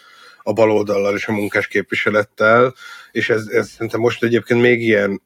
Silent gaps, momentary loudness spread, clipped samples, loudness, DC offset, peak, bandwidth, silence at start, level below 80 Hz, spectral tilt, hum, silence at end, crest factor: none; 9 LU; under 0.1%; -17 LUFS; under 0.1%; -2 dBFS; 16 kHz; 0.45 s; -64 dBFS; -6 dB/octave; none; 0.1 s; 16 dB